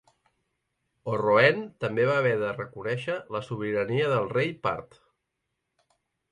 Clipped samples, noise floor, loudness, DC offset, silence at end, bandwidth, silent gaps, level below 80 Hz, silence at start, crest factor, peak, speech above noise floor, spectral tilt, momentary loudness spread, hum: under 0.1%; -81 dBFS; -26 LUFS; under 0.1%; 1.45 s; 11 kHz; none; -64 dBFS; 1.05 s; 20 dB; -8 dBFS; 55 dB; -7 dB/octave; 12 LU; none